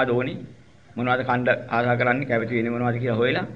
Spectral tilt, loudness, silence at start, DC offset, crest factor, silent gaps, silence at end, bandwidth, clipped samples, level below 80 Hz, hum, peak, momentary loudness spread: -8.5 dB/octave; -23 LUFS; 0 s; 0.2%; 20 dB; none; 0 s; 7 kHz; under 0.1%; -56 dBFS; none; -4 dBFS; 8 LU